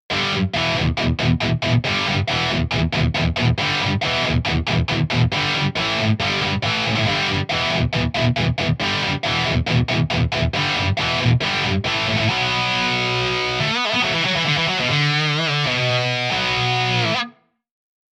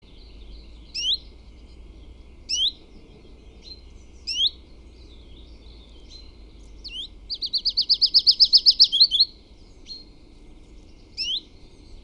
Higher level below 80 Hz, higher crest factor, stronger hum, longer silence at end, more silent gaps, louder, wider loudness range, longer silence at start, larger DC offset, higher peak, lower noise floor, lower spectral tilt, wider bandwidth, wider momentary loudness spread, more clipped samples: first, -36 dBFS vs -46 dBFS; second, 14 dB vs 22 dB; neither; first, 0.8 s vs 0.05 s; neither; about the same, -19 LUFS vs -18 LUFS; second, 1 LU vs 14 LU; second, 0.1 s vs 0.35 s; neither; about the same, -4 dBFS vs -4 dBFS; second, -40 dBFS vs -47 dBFS; first, -5 dB/octave vs 0 dB/octave; second, 10.5 kHz vs 18.5 kHz; second, 2 LU vs 24 LU; neither